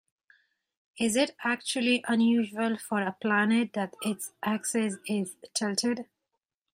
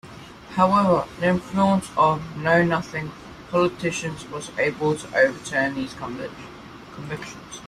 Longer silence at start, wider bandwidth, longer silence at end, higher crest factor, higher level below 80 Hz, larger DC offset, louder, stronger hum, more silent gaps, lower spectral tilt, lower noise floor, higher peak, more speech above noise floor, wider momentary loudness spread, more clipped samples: first, 0.95 s vs 0.05 s; first, 16 kHz vs 13.5 kHz; first, 0.7 s vs 0 s; about the same, 18 dB vs 18 dB; second, -74 dBFS vs -52 dBFS; neither; second, -28 LUFS vs -23 LUFS; neither; neither; second, -3.5 dB/octave vs -5.5 dB/octave; first, -84 dBFS vs -41 dBFS; second, -12 dBFS vs -4 dBFS; first, 56 dB vs 19 dB; second, 8 LU vs 18 LU; neither